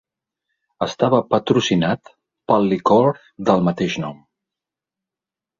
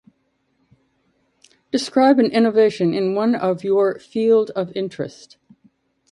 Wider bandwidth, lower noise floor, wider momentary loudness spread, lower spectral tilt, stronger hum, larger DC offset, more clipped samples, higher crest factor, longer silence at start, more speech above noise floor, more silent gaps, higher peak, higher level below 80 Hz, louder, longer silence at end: second, 7.4 kHz vs 11.5 kHz; first, -88 dBFS vs -67 dBFS; about the same, 11 LU vs 11 LU; about the same, -6 dB/octave vs -6 dB/octave; neither; neither; neither; about the same, 18 dB vs 18 dB; second, 0.8 s vs 1.75 s; first, 71 dB vs 49 dB; neither; about the same, -2 dBFS vs -2 dBFS; first, -56 dBFS vs -66 dBFS; about the same, -19 LUFS vs -18 LUFS; first, 1.45 s vs 1 s